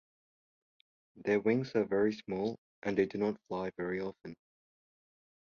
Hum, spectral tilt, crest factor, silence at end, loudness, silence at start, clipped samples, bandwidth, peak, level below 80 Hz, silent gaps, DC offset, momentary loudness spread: none; -7.5 dB/octave; 18 dB; 1.15 s; -34 LUFS; 1.15 s; under 0.1%; 7 kHz; -16 dBFS; -70 dBFS; 2.58-2.82 s; under 0.1%; 11 LU